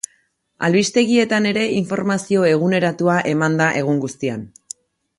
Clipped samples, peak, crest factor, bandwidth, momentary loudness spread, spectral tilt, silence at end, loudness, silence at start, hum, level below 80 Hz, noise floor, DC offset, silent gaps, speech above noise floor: under 0.1%; -4 dBFS; 14 dB; 11.5 kHz; 16 LU; -5 dB/octave; 0.7 s; -18 LUFS; 0.6 s; none; -60 dBFS; -62 dBFS; under 0.1%; none; 45 dB